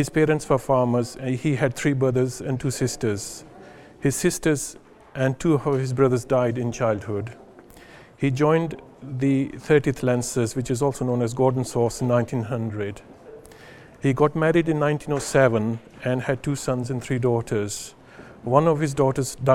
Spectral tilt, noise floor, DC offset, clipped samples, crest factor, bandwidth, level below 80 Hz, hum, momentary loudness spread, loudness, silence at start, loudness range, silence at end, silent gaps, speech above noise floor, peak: -6 dB/octave; -47 dBFS; under 0.1%; under 0.1%; 22 dB; 16 kHz; -50 dBFS; none; 10 LU; -23 LUFS; 0 s; 3 LU; 0 s; none; 25 dB; -2 dBFS